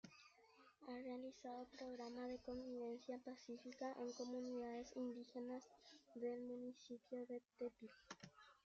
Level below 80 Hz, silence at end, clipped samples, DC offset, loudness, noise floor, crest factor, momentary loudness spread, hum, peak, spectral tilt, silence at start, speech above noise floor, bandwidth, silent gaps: -82 dBFS; 0.15 s; under 0.1%; under 0.1%; -53 LUFS; -72 dBFS; 16 dB; 12 LU; none; -36 dBFS; -4 dB/octave; 0.05 s; 20 dB; 7.6 kHz; none